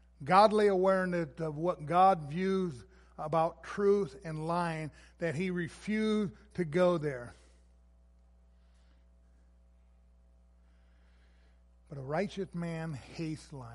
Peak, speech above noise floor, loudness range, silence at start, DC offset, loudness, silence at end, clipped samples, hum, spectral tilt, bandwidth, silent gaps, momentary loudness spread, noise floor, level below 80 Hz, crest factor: -10 dBFS; 31 dB; 13 LU; 0.2 s; under 0.1%; -31 LUFS; 0 s; under 0.1%; none; -7 dB/octave; 11.5 kHz; none; 15 LU; -62 dBFS; -60 dBFS; 22 dB